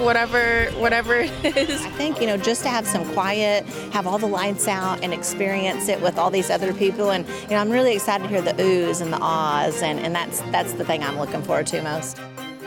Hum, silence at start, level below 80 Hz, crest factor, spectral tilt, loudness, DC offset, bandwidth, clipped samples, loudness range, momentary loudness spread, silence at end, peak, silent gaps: none; 0 s; -48 dBFS; 14 dB; -3.5 dB/octave; -22 LUFS; under 0.1%; 19 kHz; under 0.1%; 2 LU; 6 LU; 0 s; -8 dBFS; none